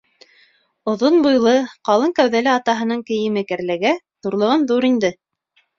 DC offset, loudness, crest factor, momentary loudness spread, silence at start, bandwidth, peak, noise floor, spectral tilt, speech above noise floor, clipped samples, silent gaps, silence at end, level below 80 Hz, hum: under 0.1%; -18 LUFS; 16 dB; 9 LU; 0.85 s; 7.4 kHz; -2 dBFS; -63 dBFS; -5 dB/octave; 47 dB; under 0.1%; none; 0.65 s; -62 dBFS; none